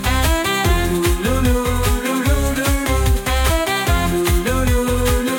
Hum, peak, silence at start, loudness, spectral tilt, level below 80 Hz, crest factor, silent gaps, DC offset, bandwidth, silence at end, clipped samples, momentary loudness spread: none; -4 dBFS; 0 s; -18 LUFS; -4.5 dB/octave; -20 dBFS; 12 dB; none; under 0.1%; 17 kHz; 0 s; under 0.1%; 1 LU